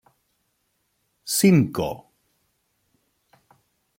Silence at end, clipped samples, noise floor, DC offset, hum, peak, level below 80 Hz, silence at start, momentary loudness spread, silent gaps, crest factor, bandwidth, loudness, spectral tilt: 2 s; under 0.1%; -72 dBFS; under 0.1%; none; -6 dBFS; -60 dBFS; 1.25 s; 23 LU; none; 22 dB; 16.5 kHz; -20 LUFS; -5.5 dB/octave